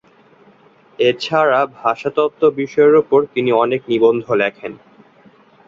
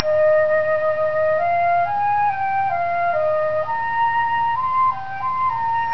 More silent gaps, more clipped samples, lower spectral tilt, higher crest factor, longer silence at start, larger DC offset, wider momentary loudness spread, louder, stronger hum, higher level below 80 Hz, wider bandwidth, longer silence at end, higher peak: neither; neither; about the same, -6.5 dB/octave vs -6 dB/octave; about the same, 16 dB vs 18 dB; first, 1 s vs 0 s; second, under 0.1% vs 2%; first, 7 LU vs 4 LU; first, -16 LUFS vs -19 LUFS; neither; about the same, -62 dBFS vs -60 dBFS; first, 7.2 kHz vs 5.4 kHz; first, 0.9 s vs 0 s; about the same, -2 dBFS vs 0 dBFS